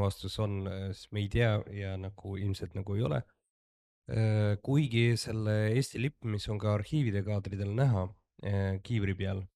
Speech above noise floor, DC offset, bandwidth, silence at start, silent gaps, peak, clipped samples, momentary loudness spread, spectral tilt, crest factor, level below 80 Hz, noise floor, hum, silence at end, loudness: over 59 dB; under 0.1%; 12.5 kHz; 0 s; 3.50-4.02 s; -16 dBFS; under 0.1%; 9 LU; -7 dB/octave; 16 dB; -54 dBFS; under -90 dBFS; none; 0.1 s; -32 LUFS